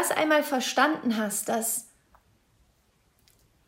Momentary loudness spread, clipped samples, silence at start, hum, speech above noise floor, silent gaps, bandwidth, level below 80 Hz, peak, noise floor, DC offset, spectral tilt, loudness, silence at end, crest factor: 5 LU; under 0.1%; 0 s; none; 41 dB; none; 16 kHz; -70 dBFS; -8 dBFS; -67 dBFS; under 0.1%; -2 dB/octave; -26 LUFS; 1.85 s; 20 dB